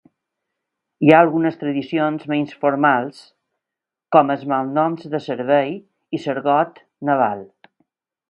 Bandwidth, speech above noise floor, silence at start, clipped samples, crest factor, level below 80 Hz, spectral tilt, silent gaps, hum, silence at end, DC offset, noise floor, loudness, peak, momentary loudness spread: 8.4 kHz; 68 dB; 1 s; under 0.1%; 20 dB; -68 dBFS; -8 dB/octave; none; none; 0.85 s; under 0.1%; -86 dBFS; -19 LUFS; 0 dBFS; 13 LU